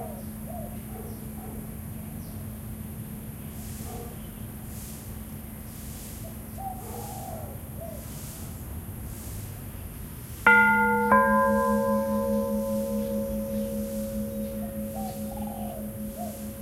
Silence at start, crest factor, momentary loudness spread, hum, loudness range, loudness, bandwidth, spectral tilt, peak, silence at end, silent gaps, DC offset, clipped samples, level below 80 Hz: 0 s; 24 dB; 18 LU; none; 16 LU; -29 LUFS; 16 kHz; -5.5 dB/octave; -6 dBFS; 0 s; none; under 0.1%; under 0.1%; -44 dBFS